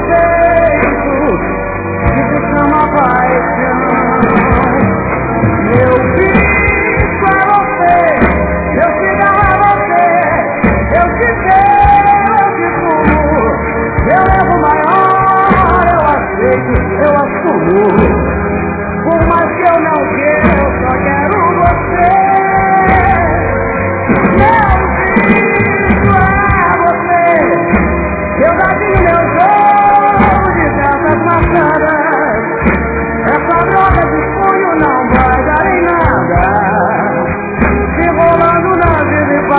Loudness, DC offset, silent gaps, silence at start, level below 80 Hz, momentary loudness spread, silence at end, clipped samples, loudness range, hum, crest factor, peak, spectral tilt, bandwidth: -10 LUFS; under 0.1%; none; 0 s; -22 dBFS; 5 LU; 0 s; 0.3%; 2 LU; none; 10 dB; 0 dBFS; -11 dB/octave; 4 kHz